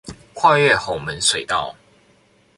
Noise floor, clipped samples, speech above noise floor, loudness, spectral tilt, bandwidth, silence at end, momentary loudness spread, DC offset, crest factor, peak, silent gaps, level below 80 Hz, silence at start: -56 dBFS; under 0.1%; 38 dB; -17 LUFS; -2.5 dB/octave; 11.5 kHz; 0.85 s; 14 LU; under 0.1%; 20 dB; 0 dBFS; none; -50 dBFS; 0.05 s